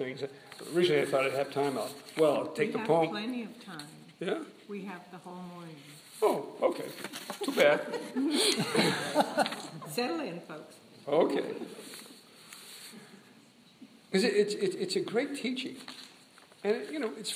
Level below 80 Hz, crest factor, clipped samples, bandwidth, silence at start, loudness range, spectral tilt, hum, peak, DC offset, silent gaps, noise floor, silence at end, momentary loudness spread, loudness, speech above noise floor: -84 dBFS; 22 dB; under 0.1%; 15.5 kHz; 0 s; 7 LU; -4 dB/octave; none; -10 dBFS; under 0.1%; none; -59 dBFS; 0 s; 20 LU; -31 LUFS; 27 dB